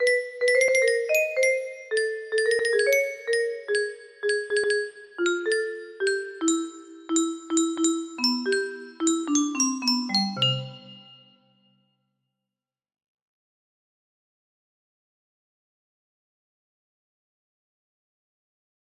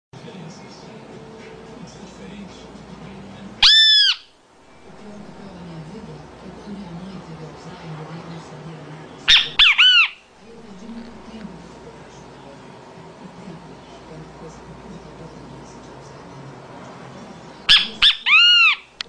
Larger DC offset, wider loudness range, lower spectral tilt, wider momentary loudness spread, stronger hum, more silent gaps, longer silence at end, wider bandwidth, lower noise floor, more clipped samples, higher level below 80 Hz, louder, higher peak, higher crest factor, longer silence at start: neither; second, 4 LU vs 23 LU; about the same, -2.5 dB/octave vs -1.5 dB/octave; second, 7 LU vs 29 LU; neither; neither; first, 8 s vs 0.3 s; first, 15 kHz vs 10.5 kHz; first, -90 dBFS vs -50 dBFS; neither; second, -76 dBFS vs -50 dBFS; second, -24 LUFS vs -12 LUFS; second, -10 dBFS vs 0 dBFS; about the same, 18 dB vs 22 dB; second, 0 s vs 0.25 s